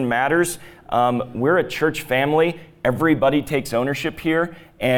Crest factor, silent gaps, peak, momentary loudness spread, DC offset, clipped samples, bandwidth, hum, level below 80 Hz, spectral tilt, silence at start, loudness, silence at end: 14 dB; none; -6 dBFS; 7 LU; under 0.1%; under 0.1%; 19 kHz; none; -50 dBFS; -5.5 dB/octave; 0 s; -20 LUFS; 0 s